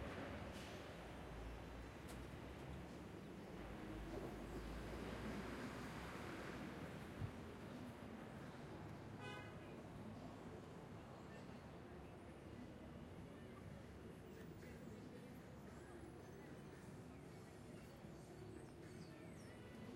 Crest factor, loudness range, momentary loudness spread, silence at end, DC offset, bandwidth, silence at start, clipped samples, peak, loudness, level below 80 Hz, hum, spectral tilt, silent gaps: 18 dB; 6 LU; 7 LU; 0 s; under 0.1%; 16 kHz; 0 s; under 0.1%; -36 dBFS; -55 LUFS; -64 dBFS; none; -6 dB/octave; none